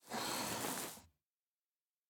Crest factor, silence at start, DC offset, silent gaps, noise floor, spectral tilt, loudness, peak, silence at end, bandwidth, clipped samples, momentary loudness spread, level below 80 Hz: 22 dB; 0.05 s; under 0.1%; none; under -90 dBFS; -2 dB/octave; -41 LUFS; -24 dBFS; 1.05 s; over 20 kHz; under 0.1%; 9 LU; -76 dBFS